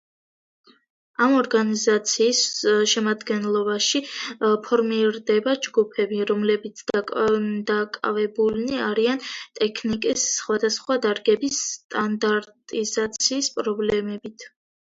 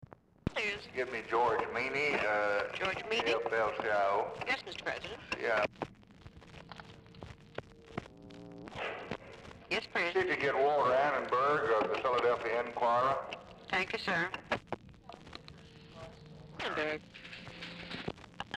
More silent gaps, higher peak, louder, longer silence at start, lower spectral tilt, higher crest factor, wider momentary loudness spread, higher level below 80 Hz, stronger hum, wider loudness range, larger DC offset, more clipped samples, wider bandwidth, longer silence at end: first, 11.84-11.89 s vs none; first, -6 dBFS vs -20 dBFS; first, -22 LUFS vs -33 LUFS; first, 1.2 s vs 0 s; second, -2.5 dB/octave vs -4.5 dB/octave; about the same, 18 dB vs 16 dB; second, 7 LU vs 21 LU; about the same, -62 dBFS vs -62 dBFS; neither; second, 3 LU vs 12 LU; neither; neither; second, 7.8 kHz vs 12 kHz; first, 0.5 s vs 0 s